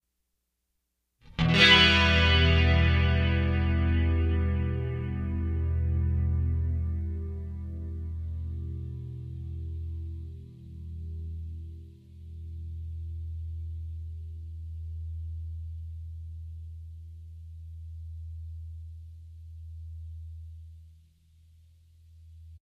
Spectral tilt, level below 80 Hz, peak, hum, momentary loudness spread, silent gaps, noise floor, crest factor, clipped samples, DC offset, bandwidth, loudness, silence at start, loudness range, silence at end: -5.5 dB/octave; -36 dBFS; -6 dBFS; none; 24 LU; none; -80 dBFS; 24 dB; under 0.1%; under 0.1%; 8 kHz; -27 LUFS; 1.25 s; 22 LU; 0.1 s